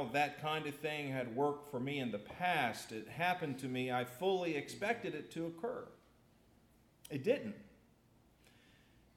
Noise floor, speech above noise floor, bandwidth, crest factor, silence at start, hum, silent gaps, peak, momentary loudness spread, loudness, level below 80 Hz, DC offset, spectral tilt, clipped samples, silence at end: -69 dBFS; 30 dB; 18 kHz; 20 dB; 0 s; none; none; -20 dBFS; 10 LU; -39 LUFS; -76 dBFS; under 0.1%; -5 dB/octave; under 0.1%; 1.45 s